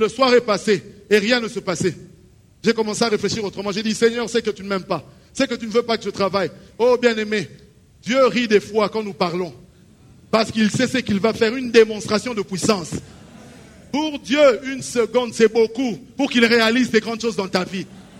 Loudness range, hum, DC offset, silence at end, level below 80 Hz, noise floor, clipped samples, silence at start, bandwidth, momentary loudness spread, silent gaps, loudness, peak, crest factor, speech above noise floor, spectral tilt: 3 LU; none; under 0.1%; 0.2 s; -54 dBFS; -50 dBFS; under 0.1%; 0 s; 15 kHz; 10 LU; none; -19 LUFS; -2 dBFS; 18 dB; 31 dB; -4.5 dB/octave